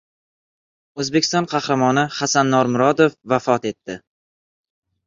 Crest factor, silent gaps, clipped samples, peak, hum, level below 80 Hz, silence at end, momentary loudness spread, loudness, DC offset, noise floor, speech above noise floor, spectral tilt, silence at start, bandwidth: 18 dB; none; under 0.1%; -2 dBFS; none; -60 dBFS; 1.1 s; 15 LU; -18 LUFS; under 0.1%; under -90 dBFS; over 72 dB; -4.5 dB/octave; 0.95 s; 7.6 kHz